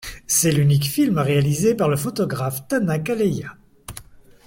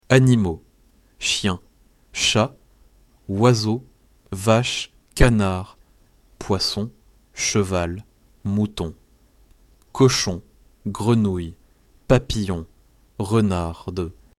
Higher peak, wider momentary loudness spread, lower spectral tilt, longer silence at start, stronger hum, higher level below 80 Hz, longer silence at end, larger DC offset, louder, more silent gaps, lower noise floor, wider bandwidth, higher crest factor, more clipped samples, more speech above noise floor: about the same, -4 dBFS vs -2 dBFS; first, 20 LU vs 17 LU; about the same, -5 dB/octave vs -5 dB/octave; about the same, 0 s vs 0.1 s; neither; second, -48 dBFS vs -38 dBFS; first, 0.45 s vs 0.25 s; neither; about the same, -20 LUFS vs -21 LUFS; neither; second, -43 dBFS vs -57 dBFS; first, 16.5 kHz vs 13.5 kHz; about the same, 16 dB vs 20 dB; neither; second, 24 dB vs 37 dB